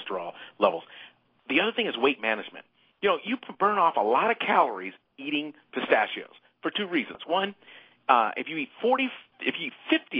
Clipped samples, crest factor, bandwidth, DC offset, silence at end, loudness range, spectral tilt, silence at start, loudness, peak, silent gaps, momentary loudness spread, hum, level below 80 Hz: under 0.1%; 24 dB; 5.2 kHz; under 0.1%; 0 s; 3 LU; -7 dB/octave; 0 s; -27 LUFS; -4 dBFS; none; 13 LU; none; -76 dBFS